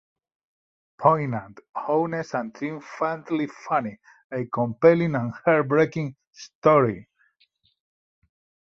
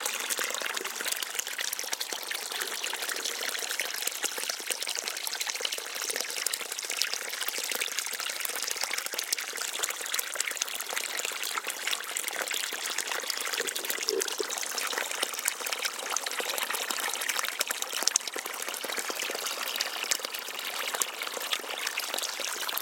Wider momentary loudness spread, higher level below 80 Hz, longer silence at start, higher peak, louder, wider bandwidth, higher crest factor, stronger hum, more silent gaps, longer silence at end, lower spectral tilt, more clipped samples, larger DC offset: first, 15 LU vs 3 LU; first, -64 dBFS vs -88 dBFS; first, 1 s vs 0 s; about the same, -2 dBFS vs 0 dBFS; first, -24 LUFS vs -30 LUFS; second, 7.2 kHz vs 17 kHz; second, 22 dB vs 32 dB; neither; first, 1.69-1.73 s, 4.24-4.30 s, 6.27-6.31 s, 6.55-6.62 s vs none; first, 1.7 s vs 0 s; first, -8 dB/octave vs 2.5 dB/octave; neither; neither